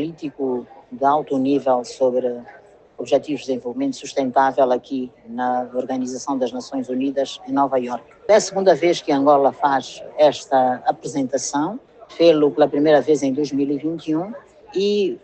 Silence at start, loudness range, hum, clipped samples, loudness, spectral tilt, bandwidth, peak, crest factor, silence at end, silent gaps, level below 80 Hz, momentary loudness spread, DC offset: 0 s; 4 LU; none; under 0.1%; -20 LUFS; -5 dB/octave; 8.8 kHz; -2 dBFS; 18 dB; 0.05 s; none; -64 dBFS; 12 LU; under 0.1%